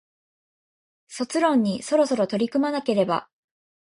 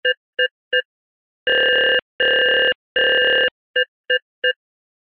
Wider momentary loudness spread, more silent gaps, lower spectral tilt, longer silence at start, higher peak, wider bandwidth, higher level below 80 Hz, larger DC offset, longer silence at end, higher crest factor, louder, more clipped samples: about the same, 7 LU vs 8 LU; second, none vs 0.17-0.33 s, 0.51-0.71 s, 0.85-1.46 s, 2.02-2.19 s, 2.75-2.95 s, 3.51-3.74 s, 3.88-4.04 s, 4.22-4.42 s; about the same, -5.5 dB/octave vs -4.5 dB/octave; first, 1.1 s vs 0.05 s; about the same, -8 dBFS vs -6 dBFS; first, 11.5 kHz vs 5.6 kHz; second, -70 dBFS vs -60 dBFS; neither; about the same, 0.7 s vs 0.6 s; about the same, 18 dB vs 14 dB; second, -23 LUFS vs -17 LUFS; neither